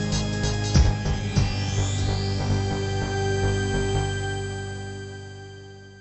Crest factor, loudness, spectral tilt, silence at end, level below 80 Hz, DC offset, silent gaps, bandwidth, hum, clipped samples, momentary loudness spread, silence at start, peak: 18 dB; -25 LUFS; -5 dB/octave; 0 s; -32 dBFS; under 0.1%; none; 8.4 kHz; 50 Hz at -45 dBFS; under 0.1%; 16 LU; 0 s; -6 dBFS